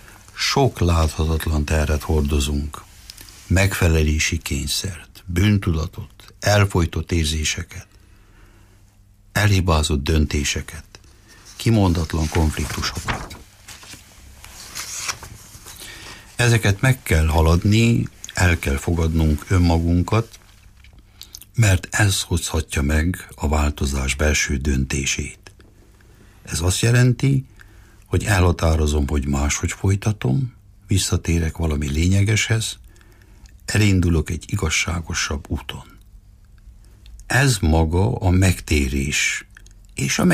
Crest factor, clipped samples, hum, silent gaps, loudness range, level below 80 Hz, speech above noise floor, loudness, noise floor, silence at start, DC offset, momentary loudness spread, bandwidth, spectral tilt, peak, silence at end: 16 dB; under 0.1%; none; none; 4 LU; -28 dBFS; 32 dB; -20 LUFS; -51 dBFS; 0.1 s; under 0.1%; 18 LU; 15.5 kHz; -5 dB/octave; -6 dBFS; 0 s